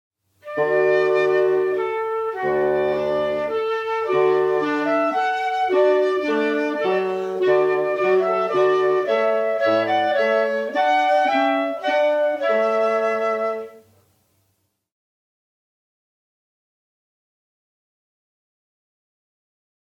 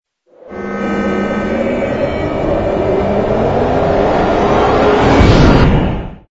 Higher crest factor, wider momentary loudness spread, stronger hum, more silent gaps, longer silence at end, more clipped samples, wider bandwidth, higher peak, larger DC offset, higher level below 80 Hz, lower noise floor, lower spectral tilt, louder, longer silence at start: about the same, 14 dB vs 12 dB; second, 5 LU vs 10 LU; neither; neither; first, 6.2 s vs 0.15 s; second, under 0.1% vs 0.2%; about the same, 8 kHz vs 8 kHz; second, -6 dBFS vs 0 dBFS; neither; second, -66 dBFS vs -22 dBFS; first, -70 dBFS vs -39 dBFS; second, -5.5 dB/octave vs -7.5 dB/octave; second, -20 LUFS vs -13 LUFS; about the same, 0.45 s vs 0.45 s